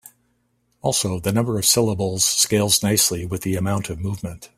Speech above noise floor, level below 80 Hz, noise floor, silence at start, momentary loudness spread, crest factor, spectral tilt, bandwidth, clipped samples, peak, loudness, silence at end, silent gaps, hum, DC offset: 46 dB; -50 dBFS; -67 dBFS; 0.05 s; 11 LU; 18 dB; -3.5 dB/octave; 16 kHz; under 0.1%; -4 dBFS; -19 LUFS; 0.1 s; none; 60 Hz at -45 dBFS; under 0.1%